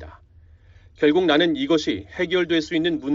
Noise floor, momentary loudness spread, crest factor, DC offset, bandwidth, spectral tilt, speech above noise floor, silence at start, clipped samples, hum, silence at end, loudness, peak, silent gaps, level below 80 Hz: -51 dBFS; 6 LU; 16 dB; under 0.1%; 7.6 kHz; -3 dB/octave; 30 dB; 0 s; under 0.1%; none; 0 s; -21 LUFS; -6 dBFS; none; -52 dBFS